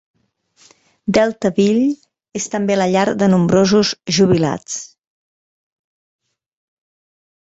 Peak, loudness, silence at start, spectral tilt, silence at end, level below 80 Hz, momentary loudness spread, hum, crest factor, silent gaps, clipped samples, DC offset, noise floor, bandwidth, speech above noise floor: -2 dBFS; -16 LUFS; 1.05 s; -5.5 dB/octave; 2.7 s; -52 dBFS; 14 LU; none; 16 dB; none; under 0.1%; under 0.1%; -57 dBFS; 8 kHz; 42 dB